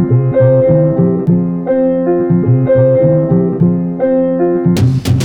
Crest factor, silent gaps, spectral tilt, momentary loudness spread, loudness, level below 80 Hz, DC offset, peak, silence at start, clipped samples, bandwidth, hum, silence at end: 10 dB; none; -9 dB/octave; 4 LU; -11 LUFS; -40 dBFS; under 0.1%; 0 dBFS; 0 s; under 0.1%; 12.5 kHz; none; 0 s